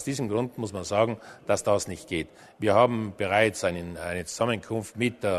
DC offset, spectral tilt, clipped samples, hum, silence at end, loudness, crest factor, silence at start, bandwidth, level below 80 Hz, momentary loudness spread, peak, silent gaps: under 0.1%; -5 dB/octave; under 0.1%; none; 0 s; -27 LUFS; 20 dB; 0 s; 13.5 kHz; -60 dBFS; 11 LU; -8 dBFS; none